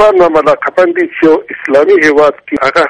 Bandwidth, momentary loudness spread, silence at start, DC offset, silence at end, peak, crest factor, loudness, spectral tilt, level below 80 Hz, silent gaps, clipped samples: 10.5 kHz; 5 LU; 0 s; under 0.1%; 0 s; 0 dBFS; 8 dB; -9 LUFS; -5 dB/octave; -44 dBFS; none; 0.1%